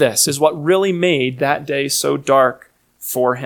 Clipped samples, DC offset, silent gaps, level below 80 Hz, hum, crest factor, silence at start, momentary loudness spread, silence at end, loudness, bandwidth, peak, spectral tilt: under 0.1%; under 0.1%; none; -62 dBFS; none; 16 dB; 0 s; 5 LU; 0 s; -16 LUFS; 19 kHz; 0 dBFS; -3.5 dB/octave